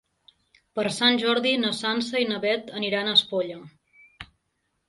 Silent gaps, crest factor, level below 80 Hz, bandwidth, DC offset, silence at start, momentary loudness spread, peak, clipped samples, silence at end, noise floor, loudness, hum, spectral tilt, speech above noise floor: none; 22 dB; -66 dBFS; 11.5 kHz; under 0.1%; 0.75 s; 15 LU; -6 dBFS; under 0.1%; 0.65 s; -75 dBFS; -23 LUFS; none; -3.5 dB/octave; 51 dB